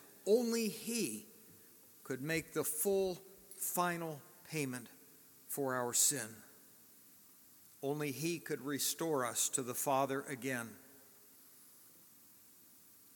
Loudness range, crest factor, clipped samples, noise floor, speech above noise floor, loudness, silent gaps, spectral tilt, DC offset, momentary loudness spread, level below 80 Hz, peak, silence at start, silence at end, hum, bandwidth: 3 LU; 22 dB; under 0.1%; -62 dBFS; 25 dB; -37 LUFS; none; -3 dB/octave; under 0.1%; 25 LU; -80 dBFS; -18 dBFS; 0 s; 1.25 s; none; 17.5 kHz